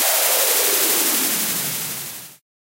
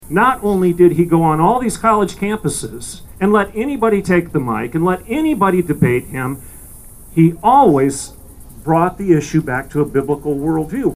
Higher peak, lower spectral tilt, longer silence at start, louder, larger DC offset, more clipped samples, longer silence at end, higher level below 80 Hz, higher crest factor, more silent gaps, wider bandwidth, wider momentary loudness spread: second, -6 dBFS vs 0 dBFS; second, 0 dB/octave vs -6.5 dB/octave; about the same, 0 s vs 0 s; about the same, -17 LUFS vs -15 LUFS; neither; neither; first, 0.35 s vs 0 s; second, -68 dBFS vs -40 dBFS; about the same, 16 dB vs 14 dB; neither; about the same, 17.5 kHz vs 16 kHz; about the same, 13 LU vs 11 LU